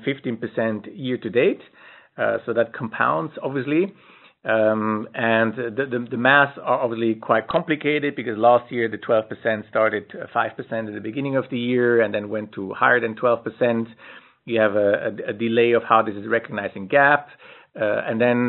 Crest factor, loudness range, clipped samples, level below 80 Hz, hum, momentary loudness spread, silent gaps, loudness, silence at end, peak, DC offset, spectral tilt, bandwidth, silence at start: 22 dB; 4 LU; under 0.1%; -68 dBFS; none; 11 LU; none; -21 LUFS; 0 s; 0 dBFS; under 0.1%; -4 dB/octave; 4.2 kHz; 0 s